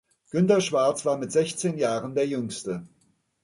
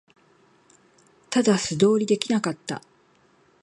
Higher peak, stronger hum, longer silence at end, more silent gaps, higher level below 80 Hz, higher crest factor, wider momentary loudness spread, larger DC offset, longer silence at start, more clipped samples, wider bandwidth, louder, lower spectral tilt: about the same, -8 dBFS vs -6 dBFS; neither; second, 0.6 s vs 0.85 s; neither; about the same, -68 dBFS vs -66 dBFS; about the same, 18 dB vs 20 dB; about the same, 11 LU vs 13 LU; neither; second, 0.35 s vs 1.3 s; neither; about the same, 11.5 kHz vs 11.5 kHz; about the same, -25 LUFS vs -23 LUFS; about the same, -5 dB/octave vs -5 dB/octave